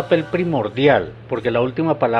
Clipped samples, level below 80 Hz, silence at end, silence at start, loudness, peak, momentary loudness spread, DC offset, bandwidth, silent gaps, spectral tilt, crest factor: under 0.1%; -50 dBFS; 0 s; 0 s; -19 LUFS; -2 dBFS; 6 LU; under 0.1%; 7.4 kHz; none; -8 dB/octave; 16 dB